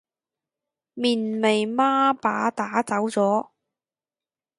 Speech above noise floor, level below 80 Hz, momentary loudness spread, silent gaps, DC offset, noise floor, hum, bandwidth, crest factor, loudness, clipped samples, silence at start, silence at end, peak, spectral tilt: over 68 dB; -74 dBFS; 5 LU; none; under 0.1%; under -90 dBFS; none; 11.5 kHz; 18 dB; -23 LUFS; under 0.1%; 0.95 s; 1.15 s; -6 dBFS; -4.5 dB/octave